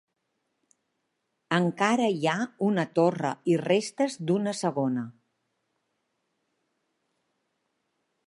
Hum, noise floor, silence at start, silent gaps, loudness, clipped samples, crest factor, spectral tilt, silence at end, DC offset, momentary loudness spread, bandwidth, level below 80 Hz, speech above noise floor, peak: none; -79 dBFS; 1.5 s; none; -27 LUFS; under 0.1%; 22 dB; -5.5 dB/octave; 3.15 s; under 0.1%; 5 LU; 11.5 kHz; -78 dBFS; 53 dB; -8 dBFS